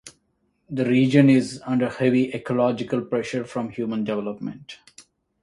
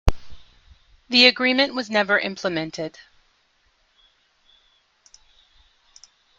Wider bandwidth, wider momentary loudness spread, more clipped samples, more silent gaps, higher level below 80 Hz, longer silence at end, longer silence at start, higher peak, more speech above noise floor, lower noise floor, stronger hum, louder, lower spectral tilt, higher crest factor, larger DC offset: about the same, 11.5 kHz vs 12.5 kHz; about the same, 17 LU vs 16 LU; neither; neither; second, -62 dBFS vs -34 dBFS; second, 0.4 s vs 3.5 s; about the same, 0.05 s vs 0.05 s; about the same, -2 dBFS vs 0 dBFS; first, 48 dB vs 44 dB; first, -70 dBFS vs -64 dBFS; neither; second, -22 LUFS vs -19 LUFS; first, -7 dB/octave vs -4 dB/octave; about the same, 20 dB vs 24 dB; neither